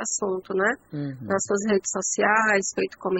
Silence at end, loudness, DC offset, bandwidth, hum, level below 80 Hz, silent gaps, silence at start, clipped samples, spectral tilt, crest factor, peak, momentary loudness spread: 0 s; -24 LUFS; under 0.1%; 8.4 kHz; none; -64 dBFS; none; 0 s; under 0.1%; -3.5 dB/octave; 18 dB; -6 dBFS; 9 LU